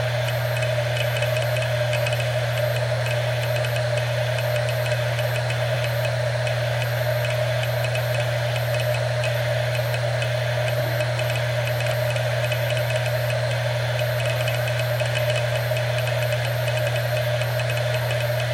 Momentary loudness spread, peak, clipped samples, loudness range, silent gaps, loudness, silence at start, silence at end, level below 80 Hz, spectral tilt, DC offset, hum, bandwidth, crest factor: 1 LU; -10 dBFS; under 0.1%; 0 LU; none; -23 LUFS; 0 s; 0 s; -48 dBFS; -5 dB/octave; under 0.1%; none; 15.5 kHz; 14 dB